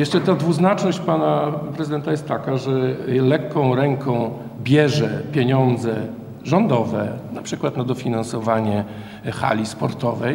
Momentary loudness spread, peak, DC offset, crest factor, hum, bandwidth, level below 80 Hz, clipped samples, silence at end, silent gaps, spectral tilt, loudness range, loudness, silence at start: 10 LU; -2 dBFS; under 0.1%; 18 dB; none; 16.5 kHz; -56 dBFS; under 0.1%; 0 s; none; -7 dB/octave; 3 LU; -20 LUFS; 0 s